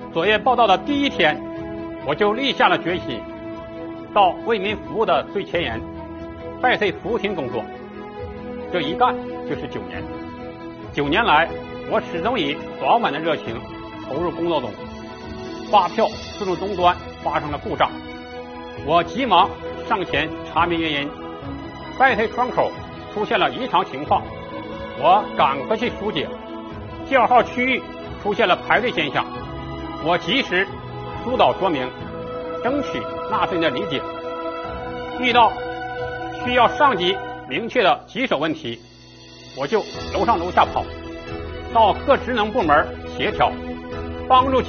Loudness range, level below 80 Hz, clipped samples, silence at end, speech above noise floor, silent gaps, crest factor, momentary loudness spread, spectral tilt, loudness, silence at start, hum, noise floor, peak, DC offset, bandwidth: 4 LU; -44 dBFS; under 0.1%; 0 s; 24 dB; none; 20 dB; 16 LU; -2.5 dB/octave; -21 LUFS; 0 s; none; -43 dBFS; -2 dBFS; under 0.1%; 6.8 kHz